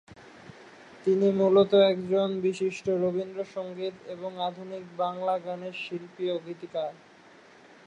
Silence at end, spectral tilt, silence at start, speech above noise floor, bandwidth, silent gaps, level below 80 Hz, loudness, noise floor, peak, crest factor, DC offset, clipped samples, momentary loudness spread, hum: 0.95 s; -6.5 dB/octave; 0.1 s; 27 dB; 8.8 kHz; none; -72 dBFS; -28 LUFS; -54 dBFS; -10 dBFS; 18 dB; under 0.1%; under 0.1%; 16 LU; none